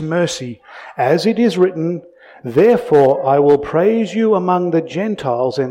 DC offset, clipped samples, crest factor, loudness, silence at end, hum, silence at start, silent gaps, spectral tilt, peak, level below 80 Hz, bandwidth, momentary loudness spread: under 0.1%; under 0.1%; 14 dB; -15 LUFS; 0 s; none; 0 s; none; -6.5 dB/octave; -2 dBFS; -56 dBFS; 11.5 kHz; 13 LU